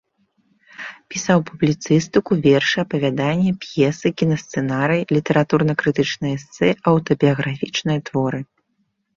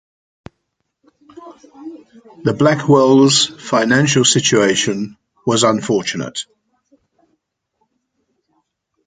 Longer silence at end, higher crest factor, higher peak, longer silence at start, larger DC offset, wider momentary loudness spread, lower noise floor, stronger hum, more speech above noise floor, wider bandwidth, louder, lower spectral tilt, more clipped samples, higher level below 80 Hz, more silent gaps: second, 0.75 s vs 2.65 s; about the same, 18 dB vs 16 dB; about the same, -2 dBFS vs 0 dBFS; second, 0.8 s vs 1.35 s; neither; second, 8 LU vs 20 LU; second, -69 dBFS vs -73 dBFS; neither; second, 51 dB vs 58 dB; second, 7.4 kHz vs 9.6 kHz; second, -19 LUFS vs -14 LUFS; first, -6 dB/octave vs -4 dB/octave; neither; about the same, -54 dBFS vs -58 dBFS; neither